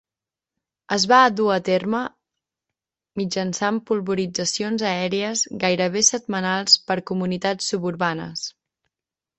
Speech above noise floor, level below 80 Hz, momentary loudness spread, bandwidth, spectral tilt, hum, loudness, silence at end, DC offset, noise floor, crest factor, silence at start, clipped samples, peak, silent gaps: 68 dB; -64 dBFS; 10 LU; 8.6 kHz; -3 dB/octave; none; -21 LUFS; 0.9 s; under 0.1%; -89 dBFS; 20 dB; 0.9 s; under 0.1%; -2 dBFS; none